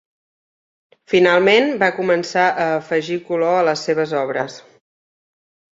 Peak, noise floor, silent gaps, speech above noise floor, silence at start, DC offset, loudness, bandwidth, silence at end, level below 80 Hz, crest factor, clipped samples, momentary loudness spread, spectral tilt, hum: -2 dBFS; under -90 dBFS; none; over 73 dB; 1.1 s; under 0.1%; -17 LUFS; 7.8 kHz; 1.15 s; -64 dBFS; 18 dB; under 0.1%; 9 LU; -5 dB/octave; none